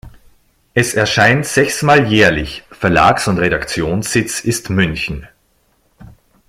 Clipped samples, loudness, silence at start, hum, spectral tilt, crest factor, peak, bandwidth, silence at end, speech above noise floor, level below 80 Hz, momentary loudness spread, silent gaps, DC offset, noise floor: under 0.1%; -14 LUFS; 0.05 s; none; -4.5 dB/octave; 16 dB; 0 dBFS; 16 kHz; 0.4 s; 45 dB; -38 dBFS; 9 LU; none; under 0.1%; -59 dBFS